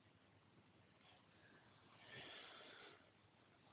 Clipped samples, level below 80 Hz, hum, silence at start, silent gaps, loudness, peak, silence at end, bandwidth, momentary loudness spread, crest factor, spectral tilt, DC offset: under 0.1%; -90 dBFS; none; 0 s; none; -61 LUFS; -46 dBFS; 0 s; 4 kHz; 13 LU; 18 dB; -1.5 dB/octave; under 0.1%